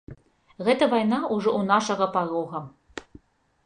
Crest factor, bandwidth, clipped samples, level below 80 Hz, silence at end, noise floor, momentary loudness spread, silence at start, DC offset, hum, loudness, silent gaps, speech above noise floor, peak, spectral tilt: 20 dB; 10 kHz; under 0.1%; -62 dBFS; 0.65 s; -53 dBFS; 20 LU; 0.1 s; under 0.1%; none; -24 LUFS; none; 30 dB; -6 dBFS; -5 dB/octave